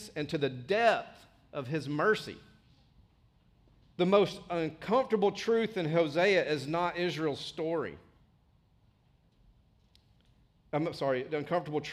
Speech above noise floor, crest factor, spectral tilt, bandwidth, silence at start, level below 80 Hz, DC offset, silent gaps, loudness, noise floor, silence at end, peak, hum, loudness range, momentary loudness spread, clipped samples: 37 dB; 20 dB; -6 dB/octave; 13.5 kHz; 0 s; -68 dBFS; under 0.1%; none; -31 LUFS; -67 dBFS; 0 s; -12 dBFS; none; 11 LU; 10 LU; under 0.1%